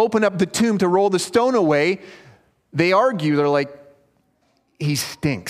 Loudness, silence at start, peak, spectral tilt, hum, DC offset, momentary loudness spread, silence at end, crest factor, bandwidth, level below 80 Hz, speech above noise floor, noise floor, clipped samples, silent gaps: -19 LUFS; 0 s; -2 dBFS; -5 dB/octave; none; under 0.1%; 7 LU; 0 s; 18 dB; 15.5 kHz; -58 dBFS; 45 dB; -64 dBFS; under 0.1%; none